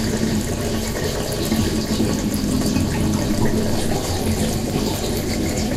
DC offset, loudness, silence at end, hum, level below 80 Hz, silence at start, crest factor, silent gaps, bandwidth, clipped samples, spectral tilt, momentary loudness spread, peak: under 0.1%; -21 LUFS; 0 s; none; -30 dBFS; 0 s; 14 dB; none; 16 kHz; under 0.1%; -5 dB/octave; 3 LU; -6 dBFS